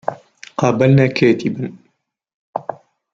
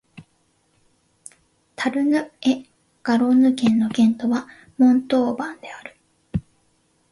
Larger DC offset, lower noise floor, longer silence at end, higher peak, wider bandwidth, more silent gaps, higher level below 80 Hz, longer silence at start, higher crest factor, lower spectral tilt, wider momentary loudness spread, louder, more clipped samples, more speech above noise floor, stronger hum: neither; about the same, -66 dBFS vs -65 dBFS; second, 0.4 s vs 0.7 s; first, -2 dBFS vs -6 dBFS; second, 7.6 kHz vs 11.5 kHz; first, 2.34-2.53 s vs none; about the same, -54 dBFS vs -52 dBFS; about the same, 0.1 s vs 0.15 s; about the same, 16 dB vs 16 dB; first, -7.5 dB/octave vs -6 dB/octave; about the same, 17 LU vs 17 LU; first, -16 LUFS vs -20 LUFS; neither; first, 52 dB vs 46 dB; neither